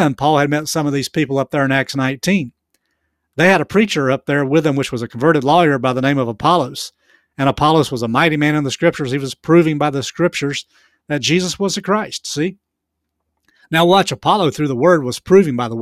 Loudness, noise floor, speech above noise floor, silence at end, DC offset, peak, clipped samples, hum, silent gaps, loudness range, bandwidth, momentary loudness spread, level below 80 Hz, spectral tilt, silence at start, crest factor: -16 LUFS; -76 dBFS; 61 dB; 0 s; under 0.1%; 0 dBFS; under 0.1%; none; none; 4 LU; 15.5 kHz; 9 LU; -50 dBFS; -5 dB/octave; 0 s; 16 dB